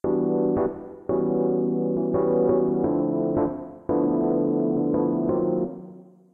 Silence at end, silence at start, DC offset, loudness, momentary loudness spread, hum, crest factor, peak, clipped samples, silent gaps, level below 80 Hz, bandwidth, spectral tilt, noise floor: 0.3 s; 0.05 s; under 0.1%; -24 LUFS; 7 LU; none; 12 dB; -12 dBFS; under 0.1%; none; -54 dBFS; 2.4 kHz; -13.5 dB/octave; -45 dBFS